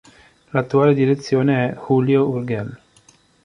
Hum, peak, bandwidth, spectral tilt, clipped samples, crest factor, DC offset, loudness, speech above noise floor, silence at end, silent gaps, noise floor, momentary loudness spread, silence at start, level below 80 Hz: none; -2 dBFS; 10.5 kHz; -8 dB/octave; under 0.1%; 18 dB; under 0.1%; -18 LUFS; 36 dB; 0.7 s; none; -54 dBFS; 10 LU; 0.55 s; -58 dBFS